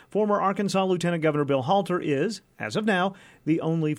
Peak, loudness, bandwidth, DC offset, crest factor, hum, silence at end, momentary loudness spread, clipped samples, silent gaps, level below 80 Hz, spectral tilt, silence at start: -10 dBFS; -25 LUFS; 13.5 kHz; under 0.1%; 14 dB; none; 0 s; 7 LU; under 0.1%; none; -68 dBFS; -6 dB/octave; 0.15 s